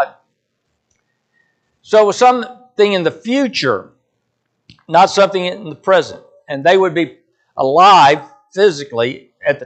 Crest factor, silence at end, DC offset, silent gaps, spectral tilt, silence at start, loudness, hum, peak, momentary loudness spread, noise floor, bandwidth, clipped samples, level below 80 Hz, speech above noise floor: 14 dB; 0 s; under 0.1%; none; -4.5 dB/octave; 0 s; -13 LUFS; none; 0 dBFS; 14 LU; -70 dBFS; 9 kHz; under 0.1%; -64 dBFS; 57 dB